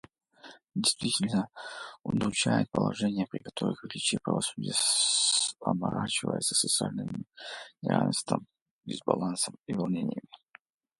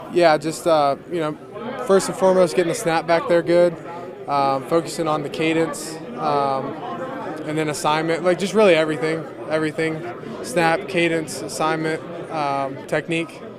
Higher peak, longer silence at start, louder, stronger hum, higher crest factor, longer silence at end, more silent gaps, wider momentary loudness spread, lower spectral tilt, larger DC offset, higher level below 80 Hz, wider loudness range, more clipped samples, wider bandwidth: second, -8 dBFS vs -2 dBFS; first, 0.45 s vs 0 s; second, -29 LUFS vs -21 LUFS; neither; about the same, 24 dB vs 20 dB; first, 0.65 s vs 0 s; first, 8.62-8.79 s, 9.59-9.63 s vs none; first, 15 LU vs 12 LU; second, -3.5 dB/octave vs -5 dB/octave; neither; about the same, -64 dBFS vs -60 dBFS; about the same, 5 LU vs 3 LU; neither; second, 12 kHz vs 15.5 kHz